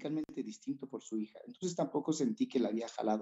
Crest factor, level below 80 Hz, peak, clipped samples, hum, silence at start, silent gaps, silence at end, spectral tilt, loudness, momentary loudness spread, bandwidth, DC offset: 18 dB; -82 dBFS; -20 dBFS; under 0.1%; none; 0 s; none; 0 s; -5.5 dB/octave; -37 LUFS; 9 LU; 8.2 kHz; under 0.1%